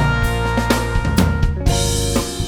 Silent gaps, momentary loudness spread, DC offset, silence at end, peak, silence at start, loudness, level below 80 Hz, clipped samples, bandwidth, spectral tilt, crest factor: none; 2 LU; under 0.1%; 0 s; 0 dBFS; 0 s; -18 LUFS; -22 dBFS; under 0.1%; over 20 kHz; -5 dB/octave; 16 dB